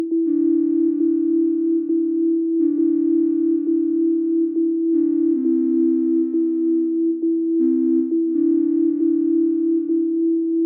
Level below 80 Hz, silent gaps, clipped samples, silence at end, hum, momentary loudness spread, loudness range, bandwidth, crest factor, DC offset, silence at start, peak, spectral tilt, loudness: -84 dBFS; none; under 0.1%; 0 s; none; 2 LU; 0 LU; 1.2 kHz; 8 dB; under 0.1%; 0 s; -10 dBFS; -11 dB/octave; -19 LUFS